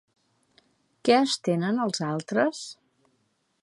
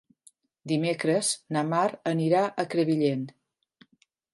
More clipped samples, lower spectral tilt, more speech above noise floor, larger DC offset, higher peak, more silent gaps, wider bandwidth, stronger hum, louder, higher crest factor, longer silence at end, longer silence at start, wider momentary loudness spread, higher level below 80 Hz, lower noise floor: neither; about the same, -5 dB/octave vs -5 dB/octave; first, 47 dB vs 42 dB; neither; first, -6 dBFS vs -10 dBFS; neither; about the same, 11.5 kHz vs 11.5 kHz; neither; about the same, -25 LUFS vs -26 LUFS; about the same, 22 dB vs 18 dB; second, 0.9 s vs 1.05 s; first, 1.05 s vs 0.65 s; first, 9 LU vs 6 LU; about the same, -78 dBFS vs -76 dBFS; first, -72 dBFS vs -68 dBFS